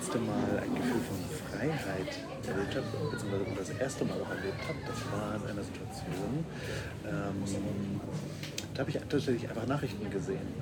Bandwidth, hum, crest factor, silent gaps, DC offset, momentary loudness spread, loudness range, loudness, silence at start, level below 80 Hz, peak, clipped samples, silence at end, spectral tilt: over 20 kHz; none; 18 dB; none; under 0.1%; 6 LU; 2 LU; -36 LUFS; 0 s; -56 dBFS; -18 dBFS; under 0.1%; 0 s; -6 dB/octave